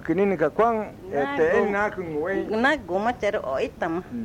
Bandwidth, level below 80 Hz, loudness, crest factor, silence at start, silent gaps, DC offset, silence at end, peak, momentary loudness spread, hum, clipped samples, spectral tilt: 14.5 kHz; -52 dBFS; -24 LUFS; 14 dB; 0 s; none; under 0.1%; 0 s; -10 dBFS; 7 LU; none; under 0.1%; -6.5 dB/octave